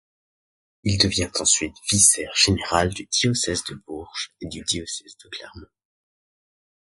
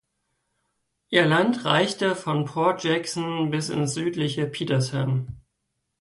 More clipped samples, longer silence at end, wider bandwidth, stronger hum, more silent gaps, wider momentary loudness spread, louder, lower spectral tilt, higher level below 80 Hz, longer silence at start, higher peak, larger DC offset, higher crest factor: neither; first, 1.25 s vs 0.6 s; about the same, 12 kHz vs 11.5 kHz; neither; neither; first, 19 LU vs 6 LU; first, -20 LUFS vs -24 LUFS; second, -2.5 dB/octave vs -5 dB/octave; first, -44 dBFS vs -60 dBFS; second, 0.85 s vs 1.1 s; about the same, -2 dBFS vs -4 dBFS; neither; about the same, 22 dB vs 20 dB